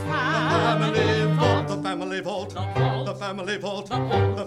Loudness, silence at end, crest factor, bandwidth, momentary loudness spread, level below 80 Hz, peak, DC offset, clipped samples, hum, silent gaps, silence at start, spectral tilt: -24 LUFS; 0 s; 16 dB; 11.5 kHz; 8 LU; -52 dBFS; -8 dBFS; under 0.1%; under 0.1%; none; none; 0 s; -6 dB/octave